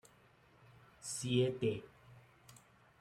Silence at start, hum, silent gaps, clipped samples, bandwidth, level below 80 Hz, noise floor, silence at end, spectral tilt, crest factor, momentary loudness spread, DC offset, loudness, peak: 1 s; none; none; under 0.1%; 14 kHz; -72 dBFS; -67 dBFS; 0.5 s; -5 dB/octave; 20 dB; 27 LU; under 0.1%; -37 LUFS; -22 dBFS